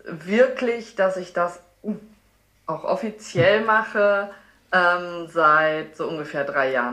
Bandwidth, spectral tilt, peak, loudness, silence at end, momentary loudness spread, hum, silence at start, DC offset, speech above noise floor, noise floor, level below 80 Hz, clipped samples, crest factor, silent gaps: 11.5 kHz; -5.5 dB/octave; -4 dBFS; -21 LUFS; 0 s; 15 LU; none; 0.05 s; under 0.1%; 39 dB; -60 dBFS; -64 dBFS; under 0.1%; 18 dB; none